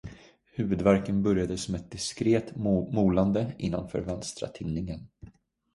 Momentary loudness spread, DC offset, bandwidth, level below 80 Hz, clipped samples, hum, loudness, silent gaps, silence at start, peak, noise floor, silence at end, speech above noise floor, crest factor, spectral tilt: 12 LU; under 0.1%; 11.5 kHz; -48 dBFS; under 0.1%; none; -28 LUFS; none; 0.05 s; -8 dBFS; -51 dBFS; 0.45 s; 23 dB; 20 dB; -6.5 dB/octave